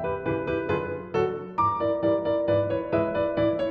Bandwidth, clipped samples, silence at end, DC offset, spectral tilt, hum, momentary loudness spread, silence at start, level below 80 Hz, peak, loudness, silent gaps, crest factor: 6.2 kHz; under 0.1%; 0 s; under 0.1%; -8.5 dB/octave; none; 4 LU; 0 s; -52 dBFS; -12 dBFS; -26 LUFS; none; 14 dB